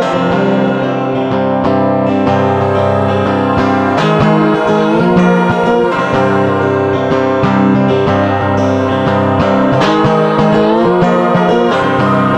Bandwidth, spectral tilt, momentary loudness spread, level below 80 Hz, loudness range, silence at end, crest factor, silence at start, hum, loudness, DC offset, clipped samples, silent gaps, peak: 9.4 kHz; -7.5 dB/octave; 3 LU; -40 dBFS; 2 LU; 0 s; 10 dB; 0 s; none; -11 LUFS; under 0.1%; under 0.1%; none; -2 dBFS